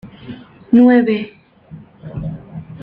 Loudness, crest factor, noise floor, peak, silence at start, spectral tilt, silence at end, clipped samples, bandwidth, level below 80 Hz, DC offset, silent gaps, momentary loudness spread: -14 LUFS; 16 dB; -39 dBFS; -2 dBFS; 0.05 s; -10 dB/octave; 0.05 s; under 0.1%; 4.4 kHz; -48 dBFS; under 0.1%; none; 25 LU